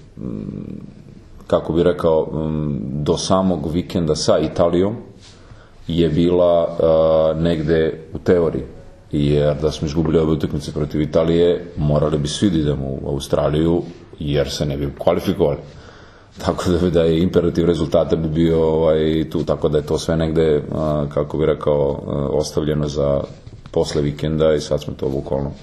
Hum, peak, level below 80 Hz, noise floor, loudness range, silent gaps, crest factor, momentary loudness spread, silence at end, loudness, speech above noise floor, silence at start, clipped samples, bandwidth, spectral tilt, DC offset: none; 0 dBFS; -36 dBFS; -42 dBFS; 3 LU; none; 18 dB; 8 LU; 0 s; -19 LUFS; 25 dB; 0 s; under 0.1%; 13 kHz; -7 dB/octave; under 0.1%